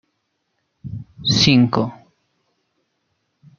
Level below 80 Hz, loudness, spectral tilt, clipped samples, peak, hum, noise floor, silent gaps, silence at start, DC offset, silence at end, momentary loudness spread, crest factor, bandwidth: -52 dBFS; -16 LUFS; -5 dB/octave; under 0.1%; -2 dBFS; none; -72 dBFS; none; 0.85 s; under 0.1%; 1.65 s; 21 LU; 20 dB; 7.4 kHz